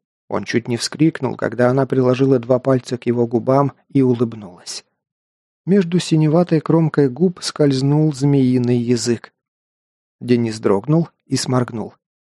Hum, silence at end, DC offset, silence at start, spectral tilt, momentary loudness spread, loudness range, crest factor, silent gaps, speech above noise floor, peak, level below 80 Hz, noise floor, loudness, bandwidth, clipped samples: none; 0.4 s; under 0.1%; 0.3 s; -6.5 dB/octave; 10 LU; 4 LU; 16 dB; 5.12-5.64 s, 9.48-10.19 s; over 73 dB; 0 dBFS; -60 dBFS; under -90 dBFS; -17 LUFS; 12 kHz; under 0.1%